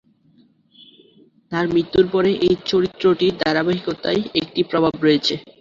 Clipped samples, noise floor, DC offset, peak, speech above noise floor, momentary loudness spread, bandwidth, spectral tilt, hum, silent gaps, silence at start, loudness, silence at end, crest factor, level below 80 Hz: under 0.1%; -56 dBFS; under 0.1%; -2 dBFS; 37 dB; 5 LU; 7.4 kHz; -6 dB/octave; none; none; 1.5 s; -19 LUFS; 0.2 s; 18 dB; -52 dBFS